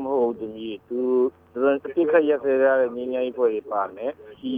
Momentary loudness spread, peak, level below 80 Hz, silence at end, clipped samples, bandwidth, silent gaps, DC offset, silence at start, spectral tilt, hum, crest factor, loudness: 13 LU; -6 dBFS; -66 dBFS; 0 s; under 0.1%; 3.7 kHz; none; under 0.1%; 0 s; -8 dB/octave; none; 16 dB; -23 LUFS